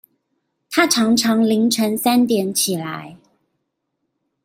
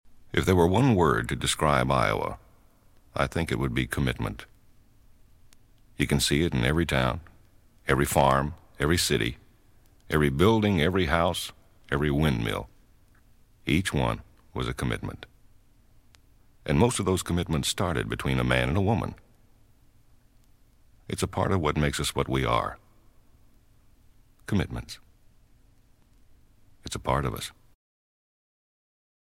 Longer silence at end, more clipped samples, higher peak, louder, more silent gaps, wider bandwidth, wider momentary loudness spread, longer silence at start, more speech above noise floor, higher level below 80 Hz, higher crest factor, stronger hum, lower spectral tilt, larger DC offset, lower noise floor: second, 1.3 s vs 1.7 s; neither; first, 0 dBFS vs -6 dBFS; first, -17 LUFS vs -26 LUFS; neither; about the same, 16.5 kHz vs 16 kHz; second, 9 LU vs 15 LU; first, 0.7 s vs 0.05 s; first, 58 dB vs 34 dB; second, -64 dBFS vs -42 dBFS; about the same, 20 dB vs 22 dB; neither; second, -3.5 dB/octave vs -5 dB/octave; neither; first, -75 dBFS vs -59 dBFS